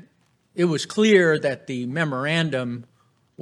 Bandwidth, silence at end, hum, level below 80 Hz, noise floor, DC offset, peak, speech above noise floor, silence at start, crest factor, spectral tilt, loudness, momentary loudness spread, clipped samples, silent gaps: 12 kHz; 0.6 s; none; -72 dBFS; -63 dBFS; under 0.1%; -4 dBFS; 42 dB; 0.55 s; 20 dB; -5.5 dB/octave; -22 LUFS; 14 LU; under 0.1%; none